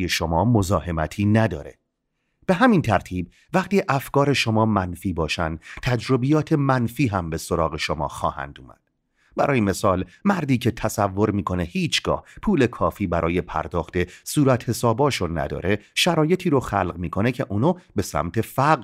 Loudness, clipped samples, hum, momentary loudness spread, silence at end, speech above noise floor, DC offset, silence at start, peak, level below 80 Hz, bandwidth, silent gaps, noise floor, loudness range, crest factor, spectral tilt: -22 LUFS; under 0.1%; none; 7 LU; 0 s; 53 dB; under 0.1%; 0 s; -2 dBFS; -42 dBFS; 16 kHz; none; -75 dBFS; 3 LU; 20 dB; -6 dB/octave